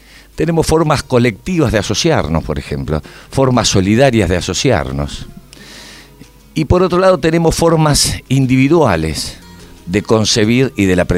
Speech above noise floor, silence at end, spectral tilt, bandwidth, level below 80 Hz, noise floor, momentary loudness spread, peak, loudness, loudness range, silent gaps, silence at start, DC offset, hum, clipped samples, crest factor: 28 dB; 0 s; -5 dB/octave; 16 kHz; -30 dBFS; -40 dBFS; 11 LU; 0 dBFS; -13 LUFS; 3 LU; none; 0.35 s; under 0.1%; none; under 0.1%; 14 dB